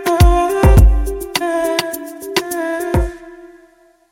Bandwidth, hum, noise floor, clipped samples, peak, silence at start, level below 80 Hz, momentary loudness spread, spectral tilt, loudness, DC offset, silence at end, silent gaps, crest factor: 17 kHz; none; -50 dBFS; under 0.1%; 0 dBFS; 0 s; -18 dBFS; 14 LU; -5.5 dB/octave; -15 LUFS; under 0.1%; 0.65 s; none; 14 dB